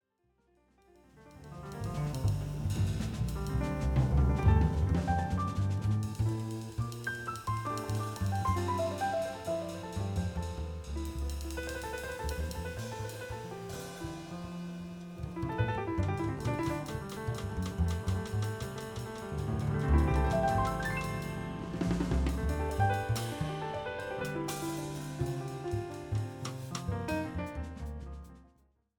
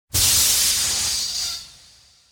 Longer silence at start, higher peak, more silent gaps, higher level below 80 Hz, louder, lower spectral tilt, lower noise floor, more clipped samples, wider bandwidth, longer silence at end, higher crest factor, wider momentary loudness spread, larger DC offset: first, 1.15 s vs 0.15 s; second, -14 dBFS vs -6 dBFS; neither; about the same, -40 dBFS vs -42 dBFS; second, -34 LUFS vs -17 LUFS; first, -6.5 dB/octave vs 0.5 dB/octave; first, -74 dBFS vs -52 dBFS; neither; about the same, 19 kHz vs 19.5 kHz; about the same, 0.55 s vs 0.6 s; about the same, 18 dB vs 16 dB; about the same, 12 LU vs 11 LU; neither